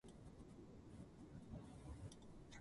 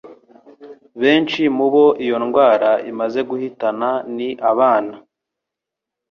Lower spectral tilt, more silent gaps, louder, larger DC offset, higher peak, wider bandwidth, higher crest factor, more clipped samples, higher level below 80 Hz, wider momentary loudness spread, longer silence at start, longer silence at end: about the same, -6 dB/octave vs -6.5 dB/octave; neither; second, -59 LUFS vs -17 LUFS; neither; second, -42 dBFS vs -2 dBFS; first, 11.5 kHz vs 6.6 kHz; about the same, 16 dB vs 16 dB; neither; about the same, -64 dBFS vs -64 dBFS; second, 5 LU vs 9 LU; about the same, 0.05 s vs 0.05 s; second, 0 s vs 1.1 s